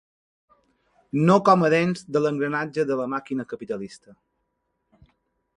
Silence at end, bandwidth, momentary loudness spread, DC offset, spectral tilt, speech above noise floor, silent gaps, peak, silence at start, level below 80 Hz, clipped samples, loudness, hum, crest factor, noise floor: 1.6 s; 11 kHz; 15 LU; under 0.1%; -7 dB/octave; 53 dB; none; -4 dBFS; 1.15 s; -66 dBFS; under 0.1%; -23 LUFS; none; 22 dB; -76 dBFS